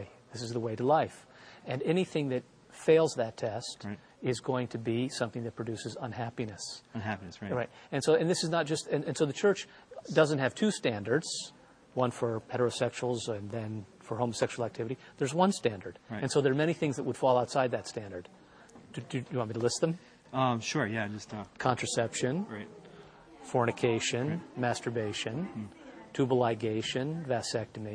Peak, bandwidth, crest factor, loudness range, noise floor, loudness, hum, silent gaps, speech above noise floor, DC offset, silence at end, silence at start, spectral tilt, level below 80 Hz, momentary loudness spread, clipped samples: -10 dBFS; 13 kHz; 22 dB; 4 LU; -55 dBFS; -32 LUFS; none; none; 23 dB; under 0.1%; 0 s; 0 s; -5 dB/octave; -68 dBFS; 13 LU; under 0.1%